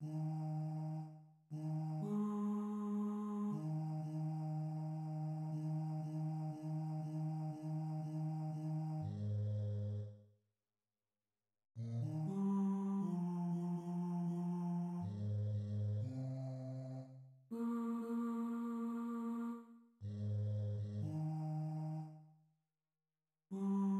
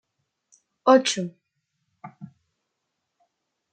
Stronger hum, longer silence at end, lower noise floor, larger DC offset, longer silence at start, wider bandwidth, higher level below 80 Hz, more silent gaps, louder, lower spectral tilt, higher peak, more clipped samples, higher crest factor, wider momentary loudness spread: neither; second, 0 s vs 1.5 s; first, under -90 dBFS vs -80 dBFS; neither; second, 0 s vs 0.85 s; about the same, 9.2 kHz vs 9 kHz; about the same, -84 dBFS vs -82 dBFS; neither; second, -42 LUFS vs -21 LUFS; first, -10 dB/octave vs -3.5 dB/octave; second, -30 dBFS vs -4 dBFS; neither; second, 12 dB vs 24 dB; second, 8 LU vs 26 LU